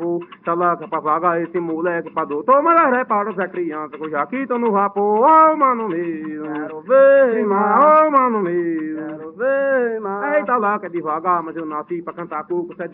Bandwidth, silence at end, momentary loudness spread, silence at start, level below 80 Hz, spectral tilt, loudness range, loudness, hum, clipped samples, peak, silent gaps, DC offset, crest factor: 3.8 kHz; 0.05 s; 15 LU; 0 s; -72 dBFS; -6 dB/octave; 6 LU; -17 LUFS; none; under 0.1%; -2 dBFS; none; under 0.1%; 16 dB